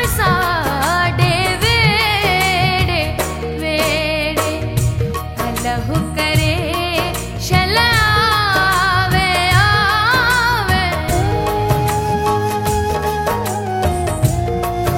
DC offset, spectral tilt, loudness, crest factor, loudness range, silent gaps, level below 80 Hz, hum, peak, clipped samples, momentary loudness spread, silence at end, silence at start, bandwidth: under 0.1%; -4.5 dB/octave; -15 LUFS; 16 dB; 5 LU; none; -28 dBFS; none; 0 dBFS; under 0.1%; 7 LU; 0 s; 0 s; 16.5 kHz